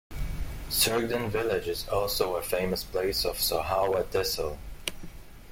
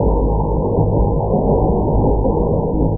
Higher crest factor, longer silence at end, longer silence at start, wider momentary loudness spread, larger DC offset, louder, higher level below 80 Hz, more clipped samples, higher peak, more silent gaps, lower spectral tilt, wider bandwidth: first, 20 dB vs 12 dB; about the same, 0 s vs 0 s; about the same, 0.1 s vs 0 s; first, 12 LU vs 2 LU; neither; second, -29 LUFS vs -17 LUFS; second, -42 dBFS vs -20 dBFS; neither; second, -10 dBFS vs -2 dBFS; neither; second, -3 dB/octave vs -19 dB/octave; first, 17 kHz vs 1.2 kHz